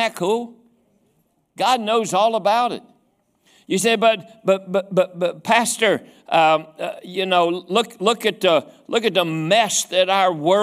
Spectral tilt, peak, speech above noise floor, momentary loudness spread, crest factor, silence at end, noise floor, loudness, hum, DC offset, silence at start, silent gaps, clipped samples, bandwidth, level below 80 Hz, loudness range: -3 dB/octave; -2 dBFS; 46 dB; 8 LU; 18 dB; 0 s; -65 dBFS; -19 LUFS; none; under 0.1%; 0 s; none; under 0.1%; 16 kHz; -70 dBFS; 3 LU